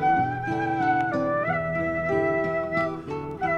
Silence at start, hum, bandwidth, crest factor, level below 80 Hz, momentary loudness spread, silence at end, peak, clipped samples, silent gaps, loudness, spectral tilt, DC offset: 0 s; none; 8.4 kHz; 12 dB; -52 dBFS; 6 LU; 0 s; -12 dBFS; under 0.1%; none; -25 LUFS; -8 dB/octave; under 0.1%